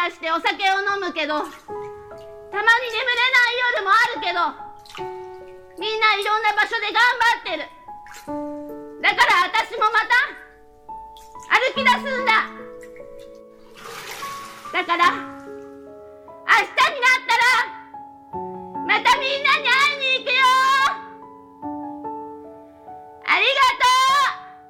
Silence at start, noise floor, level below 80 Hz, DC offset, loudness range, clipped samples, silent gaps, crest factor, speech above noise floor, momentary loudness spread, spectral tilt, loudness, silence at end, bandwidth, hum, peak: 0 s; -44 dBFS; -58 dBFS; under 0.1%; 4 LU; under 0.1%; none; 20 dB; 25 dB; 22 LU; -1 dB/octave; -18 LUFS; 0.1 s; 17.5 kHz; none; -2 dBFS